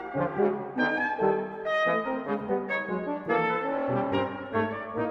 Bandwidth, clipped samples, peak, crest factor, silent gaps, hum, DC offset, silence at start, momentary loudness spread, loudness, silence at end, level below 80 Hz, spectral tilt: 7.2 kHz; under 0.1%; -12 dBFS; 16 dB; none; none; under 0.1%; 0 s; 5 LU; -28 LUFS; 0 s; -64 dBFS; -7.5 dB/octave